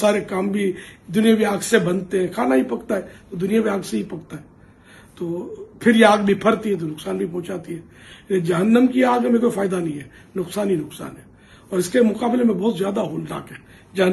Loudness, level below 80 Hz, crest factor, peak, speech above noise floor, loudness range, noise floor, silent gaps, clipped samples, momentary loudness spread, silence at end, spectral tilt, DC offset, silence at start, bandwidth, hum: -20 LUFS; -56 dBFS; 20 dB; 0 dBFS; 27 dB; 3 LU; -47 dBFS; none; under 0.1%; 17 LU; 0 s; -5.5 dB/octave; under 0.1%; 0 s; 13 kHz; none